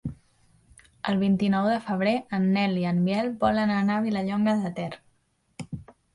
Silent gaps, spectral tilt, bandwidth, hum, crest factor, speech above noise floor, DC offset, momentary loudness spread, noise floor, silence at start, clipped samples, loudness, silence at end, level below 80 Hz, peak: none; -7.5 dB/octave; 11 kHz; none; 16 dB; 45 dB; under 0.1%; 16 LU; -69 dBFS; 0.05 s; under 0.1%; -25 LUFS; 0.3 s; -56 dBFS; -12 dBFS